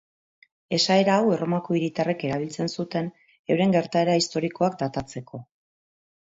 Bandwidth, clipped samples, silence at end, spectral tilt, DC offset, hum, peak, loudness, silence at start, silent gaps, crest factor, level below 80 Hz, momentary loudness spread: 8 kHz; under 0.1%; 0.75 s; -5.5 dB/octave; under 0.1%; none; -8 dBFS; -24 LUFS; 0.7 s; 3.39-3.44 s; 18 dB; -62 dBFS; 15 LU